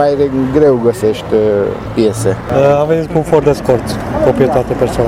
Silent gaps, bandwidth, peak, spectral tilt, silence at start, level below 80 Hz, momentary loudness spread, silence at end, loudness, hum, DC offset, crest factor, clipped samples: none; 15.5 kHz; 0 dBFS; -7 dB/octave; 0 s; -32 dBFS; 5 LU; 0 s; -12 LUFS; none; under 0.1%; 12 dB; 0.2%